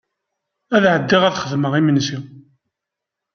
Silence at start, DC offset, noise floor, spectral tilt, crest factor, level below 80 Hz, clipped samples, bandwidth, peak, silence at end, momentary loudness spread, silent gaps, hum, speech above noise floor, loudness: 0.7 s; under 0.1%; -83 dBFS; -5.5 dB/octave; 18 dB; -60 dBFS; under 0.1%; 7 kHz; -2 dBFS; 0.95 s; 8 LU; none; none; 67 dB; -17 LUFS